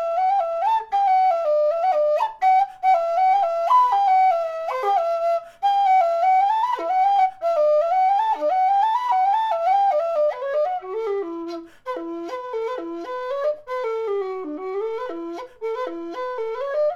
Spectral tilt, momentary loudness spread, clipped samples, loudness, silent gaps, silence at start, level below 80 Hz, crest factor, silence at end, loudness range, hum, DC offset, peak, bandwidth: -3.5 dB/octave; 12 LU; under 0.1%; -21 LUFS; none; 0 s; -66 dBFS; 12 dB; 0 s; 9 LU; none; under 0.1%; -8 dBFS; 7.2 kHz